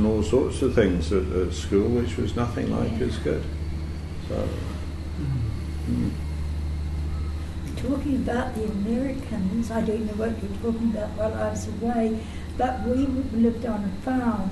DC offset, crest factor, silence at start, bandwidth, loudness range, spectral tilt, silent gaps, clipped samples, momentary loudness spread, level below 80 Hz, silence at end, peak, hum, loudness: under 0.1%; 18 dB; 0 s; 12.5 kHz; 5 LU; -7.5 dB/octave; none; under 0.1%; 9 LU; -34 dBFS; 0 s; -6 dBFS; none; -26 LUFS